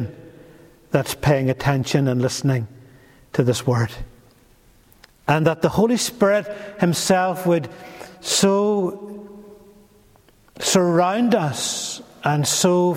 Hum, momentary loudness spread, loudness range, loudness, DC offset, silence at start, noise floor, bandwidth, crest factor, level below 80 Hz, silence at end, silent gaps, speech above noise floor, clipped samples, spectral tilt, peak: none; 15 LU; 3 LU; -20 LUFS; under 0.1%; 0 s; -54 dBFS; 16.5 kHz; 18 dB; -50 dBFS; 0 s; none; 34 dB; under 0.1%; -5 dB/octave; -2 dBFS